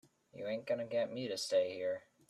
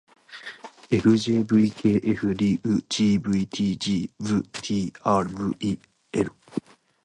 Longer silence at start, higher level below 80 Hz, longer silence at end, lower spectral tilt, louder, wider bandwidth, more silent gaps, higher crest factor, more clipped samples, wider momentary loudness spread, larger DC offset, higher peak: about the same, 0.35 s vs 0.3 s; second, -84 dBFS vs -54 dBFS; second, 0.3 s vs 0.45 s; second, -4 dB/octave vs -6 dB/octave; second, -38 LUFS vs -24 LUFS; first, 13 kHz vs 10 kHz; neither; about the same, 16 dB vs 18 dB; neither; second, 8 LU vs 15 LU; neither; second, -22 dBFS vs -6 dBFS